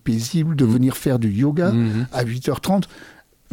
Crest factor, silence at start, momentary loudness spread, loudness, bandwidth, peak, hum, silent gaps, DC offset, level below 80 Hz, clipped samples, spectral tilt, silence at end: 14 dB; 0.05 s; 6 LU; -20 LUFS; 17 kHz; -6 dBFS; none; none; under 0.1%; -48 dBFS; under 0.1%; -7 dB/octave; 0.45 s